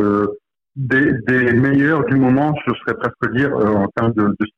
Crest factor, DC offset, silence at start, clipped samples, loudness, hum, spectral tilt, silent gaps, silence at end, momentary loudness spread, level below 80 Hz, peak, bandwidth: 10 dB; under 0.1%; 0 s; under 0.1%; -16 LUFS; none; -9 dB/octave; none; 0.1 s; 7 LU; -48 dBFS; -6 dBFS; 6 kHz